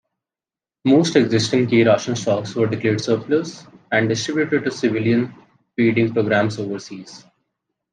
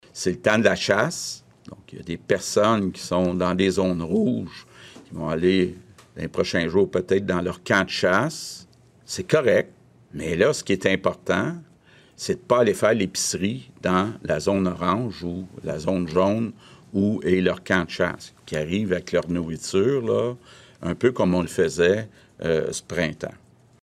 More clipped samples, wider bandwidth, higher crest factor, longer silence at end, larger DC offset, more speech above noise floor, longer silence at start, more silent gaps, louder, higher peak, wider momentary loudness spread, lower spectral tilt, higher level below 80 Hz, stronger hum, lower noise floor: neither; second, 9.6 kHz vs 15 kHz; about the same, 18 dB vs 20 dB; first, 0.75 s vs 0.5 s; neither; first, over 71 dB vs 31 dB; first, 0.85 s vs 0.15 s; neither; first, -19 LUFS vs -23 LUFS; about the same, -2 dBFS vs -4 dBFS; about the same, 13 LU vs 14 LU; about the same, -5.5 dB/octave vs -5 dB/octave; second, -64 dBFS vs -54 dBFS; neither; first, under -90 dBFS vs -54 dBFS